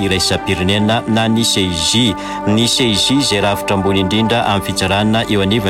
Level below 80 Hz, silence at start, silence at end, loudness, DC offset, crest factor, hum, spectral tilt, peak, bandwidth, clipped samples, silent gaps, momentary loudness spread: -38 dBFS; 0 s; 0 s; -14 LUFS; under 0.1%; 10 dB; none; -4 dB/octave; -4 dBFS; 16.5 kHz; under 0.1%; none; 4 LU